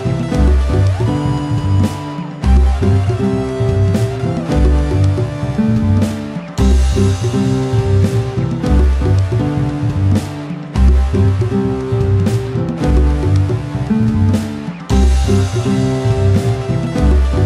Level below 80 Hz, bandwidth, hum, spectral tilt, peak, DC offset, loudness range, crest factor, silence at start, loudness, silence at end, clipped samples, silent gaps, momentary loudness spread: -18 dBFS; 11.5 kHz; none; -7.5 dB/octave; -2 dBFS; under 0.1%; 1 LU; 12 dB; 0 s; -15 LUFS; 0 s; under 0.1%; none; 5 LU